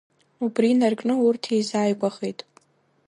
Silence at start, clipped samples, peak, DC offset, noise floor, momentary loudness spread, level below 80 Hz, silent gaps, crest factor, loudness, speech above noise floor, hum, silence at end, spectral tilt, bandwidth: 0.4 s; under 0.1%; -8 dBFS; under 0.1%; -60 dBFS; 12 LU; -74 dBFS; none; 16 dB; -23 LUFS; 38 dB; none; 0.75 s; -5.5 dB/octave; 11 kHz